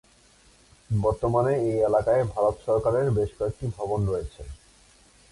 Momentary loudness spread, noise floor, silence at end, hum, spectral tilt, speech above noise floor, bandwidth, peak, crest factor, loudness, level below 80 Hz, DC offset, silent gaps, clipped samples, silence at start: 9 LU; -57 dBFS; 0.8 s; none; -8.5 dB/octave; 33 dB; 11.5 kHz; -10 dBFS; 16 dB; -25 LUFS; -44 dBFS; under 0.1%; none; under 0.1%; 0.9 s